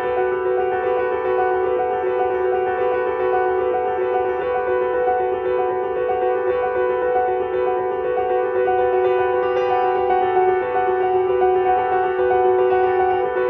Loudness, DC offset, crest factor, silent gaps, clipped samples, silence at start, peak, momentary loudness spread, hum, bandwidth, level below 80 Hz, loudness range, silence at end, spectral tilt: -19 LUFS; under 0.1%; 12 dB; none; under 0.1%; 0 s; -6 dBFS; 4 LU; none; 4 kHz; -50 dBFS; 2 LU; 0 s; -8 dB/octave